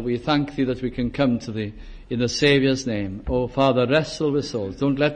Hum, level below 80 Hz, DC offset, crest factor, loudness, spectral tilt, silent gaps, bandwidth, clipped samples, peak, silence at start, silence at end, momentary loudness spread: none; -42 dBFS; under 0.1%; 16 dB; -22 LUFS; -5.5 dB/octave; none; 9.8 kHz; under 0.1%; -6 dBFS; 0 s; 0 s; 10 LU